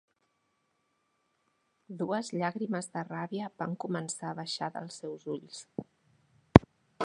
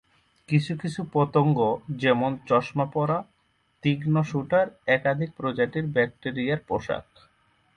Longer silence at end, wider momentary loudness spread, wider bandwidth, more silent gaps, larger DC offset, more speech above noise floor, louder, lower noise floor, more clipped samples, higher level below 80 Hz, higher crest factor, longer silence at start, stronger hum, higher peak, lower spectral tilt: second, 0 s vs 0.75 s; first, 19 LU vs 7 LU; about the same, 11 kHz vs 10 kHz; neither; neither; about the same, 41 dB vs 42 dB; second, -31 LUFS vs -25 LUFS; first, -77 dBFS vs -67 dBFS; neither; first, -48 dBFS vs -60 dBFS; first, 32 dB vs 18 dB; first, 1.9 s vs 0.5 s; neither; first, 0 dBFS vs -8 dBFS; second, -6 dB/octave vs -7.5 dB/octave